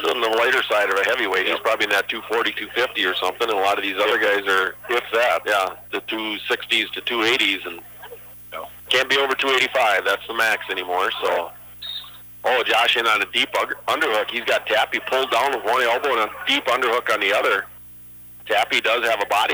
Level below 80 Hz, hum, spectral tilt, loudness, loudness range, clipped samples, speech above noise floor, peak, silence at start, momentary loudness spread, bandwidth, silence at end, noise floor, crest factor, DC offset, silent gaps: -60 dBFS; 60 Hz at -55 dBFS; -1.5 dB/octave; -20 LUFS; 2 LU; under 0.1%; 21 dB; -6 dBFS; 0 s; 14 LU; over 20 kHz; 0 s; -42 dBFS; 16 dB; under 0.1%; none